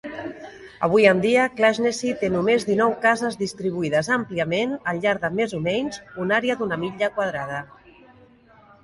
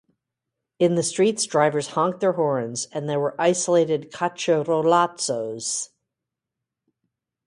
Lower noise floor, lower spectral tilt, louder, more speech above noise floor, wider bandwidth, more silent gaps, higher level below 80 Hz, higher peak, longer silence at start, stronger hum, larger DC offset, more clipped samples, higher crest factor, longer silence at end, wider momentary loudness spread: second, -52 dBFS vs -85 dBFS; about the same, -5 dB/octave vs -4 dB/octave; about the same, -22 LUFS vs -22 LUFS; second, 30 dB vs 63 dB; about the same, 11.5 kHz vs 11.5 kHz; neither; first, -58 dBFS vs -70 dBFS; about the same, -2 dBFS vs -4 dBFS; second, 0.05 s vs 0.8 s; neither; neither; neither; about the same, 20 dB vs 18 dB; second, 1.2 s vs 1.6 s; first, 13 LU vs 7 LU